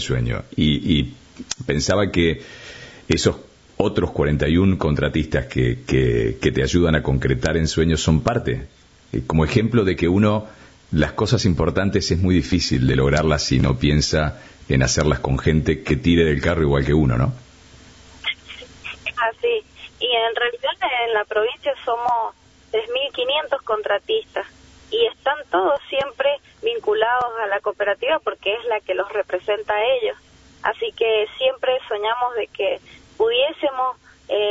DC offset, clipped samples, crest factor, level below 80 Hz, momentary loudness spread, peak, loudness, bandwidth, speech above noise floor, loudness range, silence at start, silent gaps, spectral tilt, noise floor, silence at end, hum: under 0.1%; under 0.1%; 18 dB; -34 dBFS; 9 LU; -2 dBFS; -20 LUFS; 8 kHz; 27 dB; 4 LU; 0 s; none; -5.5 dB/octave; -46 dBFS; 0 s; none